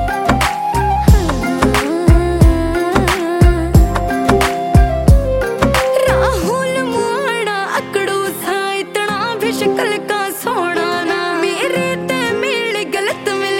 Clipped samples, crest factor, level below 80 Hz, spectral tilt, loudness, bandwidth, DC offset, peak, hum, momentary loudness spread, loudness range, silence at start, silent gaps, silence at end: under 0.1%; 14 dB; -20 dBFS; -5.5 dB/octave; -15 LUFS; 17 kHz; under 0.1%; 0 dBFS; none; 5 LU; 4 LU; 0 s; none; 0 s